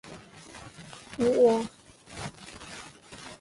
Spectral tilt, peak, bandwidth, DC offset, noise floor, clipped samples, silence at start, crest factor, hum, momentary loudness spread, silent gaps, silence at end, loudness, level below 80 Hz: -5 dB/octave; -12 dBFS; 11.5 kHz; under 0.1%; -48 dBFS; under 0.1%; 0.05 s; 18 dB; none; 24 LU; none; 0.05 s; -26 LUFS; -60 dBFS